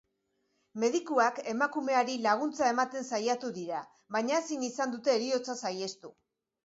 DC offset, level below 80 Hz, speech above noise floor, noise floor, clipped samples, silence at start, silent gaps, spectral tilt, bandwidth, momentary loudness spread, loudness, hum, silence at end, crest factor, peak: under 0.1%; -82 dBFS; 47 dB; -78 dBFS; under 0.1%; 0.75 s; none; -3 dB/octave; 8 kHz; 10 LU; -31 LUFS; none; 0.55 s; 18 dB; -14 dBFS